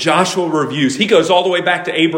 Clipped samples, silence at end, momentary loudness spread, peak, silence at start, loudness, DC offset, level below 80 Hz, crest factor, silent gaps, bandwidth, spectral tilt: under 0.1%; 0 s; 5 LU; 0 dBFS; 0 s; -14 LUFS; under 0.1%; -60 dBFS; 14 dB; none; 16.5 kHz; -4 dB/octave